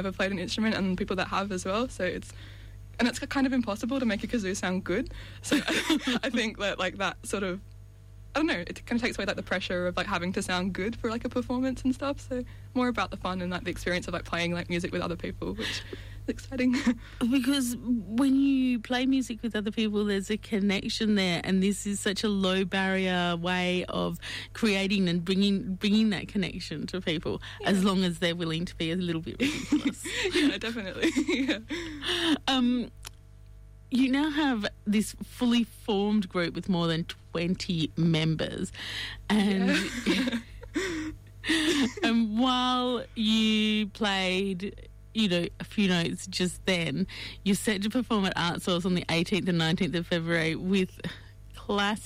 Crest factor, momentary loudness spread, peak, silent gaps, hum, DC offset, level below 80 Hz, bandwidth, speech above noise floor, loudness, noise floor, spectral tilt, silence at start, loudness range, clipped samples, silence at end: 12 dB; 9 LU; -16 dBFS; none; 50 Hz at -50 dBFS; under 0.1%; -50 dBFS; 16 kHz; 21 dB; -28 LUFS; -49 dBFS; -5 dB/octave; 0 s; 4 LU; under 0.1%; 0 s